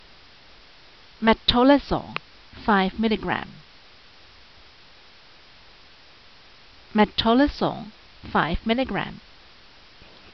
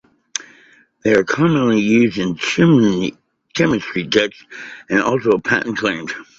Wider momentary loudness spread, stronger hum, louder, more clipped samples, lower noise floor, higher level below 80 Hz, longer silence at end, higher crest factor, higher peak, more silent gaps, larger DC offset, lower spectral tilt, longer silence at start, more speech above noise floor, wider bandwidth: first, 17 LU vs 14 LU; neither; second, -22 LUFS vs -17 LUFS; neither; about the same, -51 dBFS vs -51 dBFS; first, -44 dBFS vs -52 dBFS; first, 1.2 s vs 0.15 s; about the same, 22 dB vs 18 dB; second, -4 dBFS vs 0 dBFS; neither; first, 0.2% vs under 0.1%; second, -3 dB/octave vs -5.5 dB/octave; first, 1.2 s vs 0.35 s; second, 29 dB vs 34 dB; second, 6.2 kHz vs 8 kHz